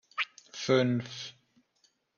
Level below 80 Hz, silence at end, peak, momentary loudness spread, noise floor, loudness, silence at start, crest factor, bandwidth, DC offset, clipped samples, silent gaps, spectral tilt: -74 dBFS; 0.85 s; -14 dBFS; 15 LU; -72 dBFS; -31 LUFS; 0.15 s; 20 dB; 7.2 kHz; under 0.1%; under 0.1%; none; -5 dB/octave